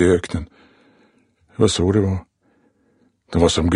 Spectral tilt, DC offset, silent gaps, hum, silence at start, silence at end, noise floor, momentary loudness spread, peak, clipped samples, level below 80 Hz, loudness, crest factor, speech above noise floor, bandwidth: -5.5 dB/octave; under 0.1%; none; none; 0 s; 0 s; -61 dBFS; 15 LU; -2 dBFS; under 0.1%; -38 dBFS; -19 LUFS; 20 dB; 44 dB; 10.5 kHz